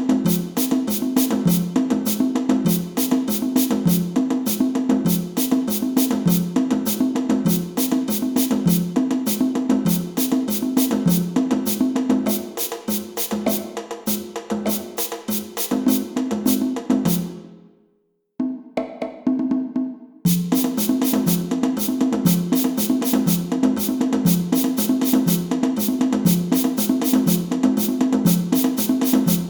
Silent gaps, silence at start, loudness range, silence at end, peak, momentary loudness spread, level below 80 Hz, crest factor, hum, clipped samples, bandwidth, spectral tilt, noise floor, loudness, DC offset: none; 0 s; 5 LU; 0 s; -4 dBFS; 6 LU; -54 dBFS; 16 dB; none; under 0.1%; over 20 kHz; -5.5 dB/octave; -66 dBFS; -20 LUFS; under 0.1%